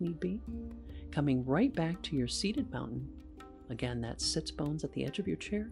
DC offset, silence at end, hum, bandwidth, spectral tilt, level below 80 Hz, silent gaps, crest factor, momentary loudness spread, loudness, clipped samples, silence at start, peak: under 0.1%; 0 s; none; 11.5 kHz; -5.5 dB/octave; -50 dBFS; none; 18 dB; 15 LU; -35 LUFS; under 0.1%; 0 s; -18 dBFS